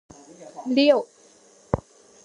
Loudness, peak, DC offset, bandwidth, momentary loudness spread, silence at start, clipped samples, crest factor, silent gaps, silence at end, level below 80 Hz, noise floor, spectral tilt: -22 LUFS; -2 dBFS; under 0.1%; 10.5 kHz; 24 LU; 0.4 s; under 0.1%; 22 dB; none; 0.5 s; -50 dBFS; -54 dBFS; -6 dB/octave